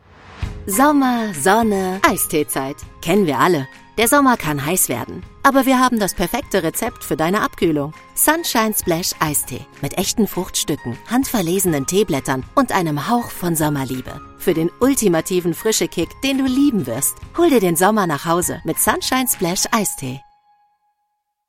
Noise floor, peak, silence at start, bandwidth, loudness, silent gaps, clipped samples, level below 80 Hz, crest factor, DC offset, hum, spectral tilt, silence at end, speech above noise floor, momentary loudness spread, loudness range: -72 dBFS; 0 dBFS; 0.25 s; 16.5 kHz; -18 LUFS; none; under 0.1%; -42 dBFS; 18 dB; under 0.1%; none; -4 dB/octave; 1.3 s; 54 dB; 9 LU; 3 LU